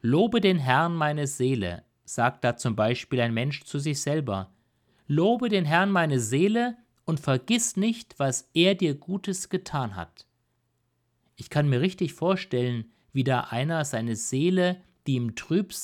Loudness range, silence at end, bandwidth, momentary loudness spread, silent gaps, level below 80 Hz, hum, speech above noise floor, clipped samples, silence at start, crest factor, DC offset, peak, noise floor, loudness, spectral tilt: 4 LU; 0 s; 16 kHz; 9 LU; none; -62 dBFS; none; 48 dB; under 0.1%; 0.05 s; 20 dB; under 0.1%; -6 dBFS; -73 dBFS; -26 LUFS; -5 dB/octave